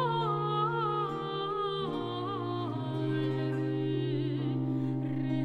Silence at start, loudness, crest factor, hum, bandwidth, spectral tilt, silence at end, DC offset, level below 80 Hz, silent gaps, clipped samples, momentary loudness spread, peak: 0 s; -32 LUFS; 12 dB; none; 5.2 kHz; -8.5 dB/octave; 0 s; under 0.1%; -66 dBFS; none; under 0.1%; 5 LU; -18 dBFS